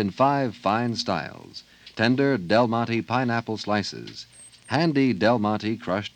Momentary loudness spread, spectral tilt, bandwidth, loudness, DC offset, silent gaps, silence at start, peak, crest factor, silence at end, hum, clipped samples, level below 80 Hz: 19 LU; -6 dB/octave; 9.4 kHz; -24 LUFS; under 0.1%; none; 0 s; -4 dBFS; 20 dB; 0.1 s; none; under 0.1%; -64 dBFS